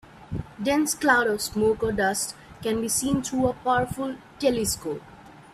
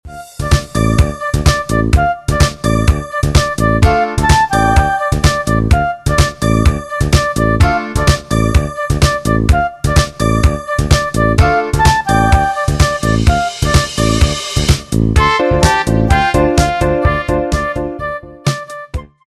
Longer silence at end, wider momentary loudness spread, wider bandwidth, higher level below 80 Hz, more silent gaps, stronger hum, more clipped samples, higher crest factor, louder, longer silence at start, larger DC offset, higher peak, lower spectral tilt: second, 0.15 s vs 0.35 s; first, 13 LU vs 6 LU; first, 15.5 kHz vs 13.5 kHz; second, -50 dBFS vs -18 dBFS; neither; neither; neither; first, 20 dB vs 12 dB; second, -25 LUFS vs -13 LUFS; about the same, 0.15 s vs 0.05 s; neither; second, -6 dBFS vs 0 dBFS; second, -3.5 dB/octave vs -5.5 dB/octave